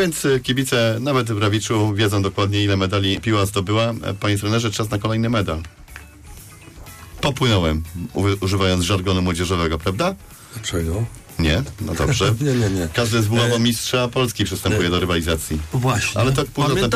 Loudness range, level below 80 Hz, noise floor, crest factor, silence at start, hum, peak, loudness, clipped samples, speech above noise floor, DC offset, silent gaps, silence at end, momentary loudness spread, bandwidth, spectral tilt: 4 LU; -36 dBFS; -40 dBFS; 10 dB; 0 s; none; -10 dBFS; -20 LUFS; under 0.1%; 21 dB; under 0.1%; none; 0 s; 8 LU; 15.5 kHz; -5 dB/octave